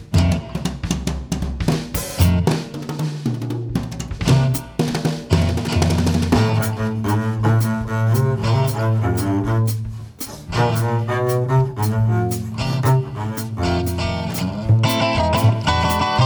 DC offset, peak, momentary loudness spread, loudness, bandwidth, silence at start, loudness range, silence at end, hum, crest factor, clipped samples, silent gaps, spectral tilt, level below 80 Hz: under 0.1%; -2 dBFS; 8 LU; -20 LUFS; over 20 kHz; 0 s; 2 LU; 0 s; none; 18 dB; under 0.1%; none; -6 dB/octave; -34 dBFS